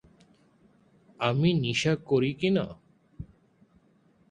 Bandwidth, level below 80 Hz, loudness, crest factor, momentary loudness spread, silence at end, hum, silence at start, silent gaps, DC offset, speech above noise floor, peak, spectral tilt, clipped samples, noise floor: 9.8 kHz; -58 dBFS; -27 LUFS; 20 dB; 22 LU; 1.05 s; none; 1.2 s; none; under 0.1%; 38 dB; -10 dBFS; -6 dB/octave; under 0.1%; -64 dBFS